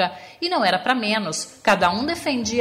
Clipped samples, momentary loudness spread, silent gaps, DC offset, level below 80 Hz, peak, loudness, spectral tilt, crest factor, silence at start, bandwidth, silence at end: under 0.1%; 7 LU; none; under 0.1%; -54 dBFS; -4 dBFS; -21 LUFS; -3 dB/octave; 18 dB; 0 s; 16 kHz; 0 s